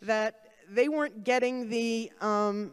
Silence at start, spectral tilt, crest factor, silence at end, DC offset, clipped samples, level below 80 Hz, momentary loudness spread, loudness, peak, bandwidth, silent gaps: 0 s; -4.5 dB/octave; 16 dB; 0 s; under 0.1%; under 0.1%; -80 dBFS; 5 LU; -29 LUFS; -14 dBFS; 12.5 kHz; none